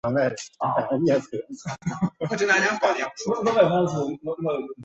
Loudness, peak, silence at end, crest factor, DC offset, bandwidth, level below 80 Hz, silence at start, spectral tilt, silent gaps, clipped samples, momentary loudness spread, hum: -24 LUFS; -6 dBFS; 0 s; 18 dB; under 0.1%; 8.2 kHz; -60 dBFS; 0.05 s; -5.5 dB/octave; none; under 0.1%; 11 LU; none